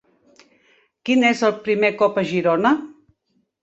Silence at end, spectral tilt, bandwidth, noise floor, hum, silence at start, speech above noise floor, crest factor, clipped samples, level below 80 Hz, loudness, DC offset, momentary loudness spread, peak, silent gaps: 0.7 s; -5.5 dB/octave; 8.2 kHz; -68 dBFS; none; 1.05 s; 50 dB; 18 dB; under 0.1%; -64 dBFS; -19 LUFS; under 0.1%; 7 LU; -4 dBFS; none